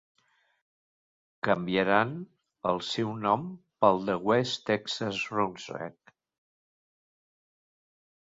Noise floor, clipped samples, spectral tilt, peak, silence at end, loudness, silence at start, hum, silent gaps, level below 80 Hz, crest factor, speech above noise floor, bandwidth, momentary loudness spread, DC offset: under -90 dBFS; under 0.1%; -5.5 dB/octave; -6 dBFS; 2.45 s; -29 LUFS; 1.45 s; none; none; -68 dBFS; 26 dB; over 62 dB; 7.8 kHz; 14 LU; under 0.1%